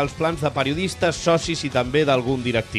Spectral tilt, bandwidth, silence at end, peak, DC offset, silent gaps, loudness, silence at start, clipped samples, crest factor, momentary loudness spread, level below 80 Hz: -5 dB/octave; 13.5 kHz; 0 s; -6 dBFS; under 0.1%; none; -21 LUFS; 0 s; under 0.1%; 16 dB; 4 LU; -44 dBFS